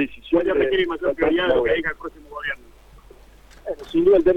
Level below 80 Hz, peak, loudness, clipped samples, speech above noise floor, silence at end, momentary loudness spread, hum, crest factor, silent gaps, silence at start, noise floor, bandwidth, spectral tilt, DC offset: -44 dBFS; -6 dBFS; -21 LUFS; under 0.1%; 27 dB; 0 s; 16 LU; none; 16 dB; none; 0 s; -47 dBFS; 8 kHz; -6.5 dB/octave; under 0.1%